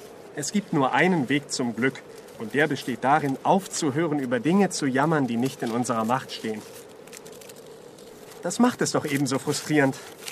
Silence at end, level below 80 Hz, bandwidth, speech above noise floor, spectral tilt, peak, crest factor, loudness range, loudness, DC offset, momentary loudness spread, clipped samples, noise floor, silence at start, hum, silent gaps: 0 s; -70 dBFS; 15 kHz; 21 dB; -5 dB/octave; -6 dBFS; 18 dB; 5 LU; -24 LUFS; under 0.1%; 21 LU; under 0.1%; -45 dBFS; 0 s; none; none